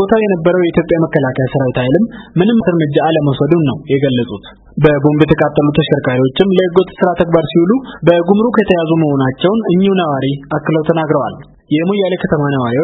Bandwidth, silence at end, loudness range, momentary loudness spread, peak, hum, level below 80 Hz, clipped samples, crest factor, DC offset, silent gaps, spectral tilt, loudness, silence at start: 4.3 kHz; 0 s; 2 LU; 5 LU; 0 dBFS; none; -42 dBFS; 0.1%; 12 dB; under 0.1%; none; -10 dB/octave; -13 LUFS; 0 s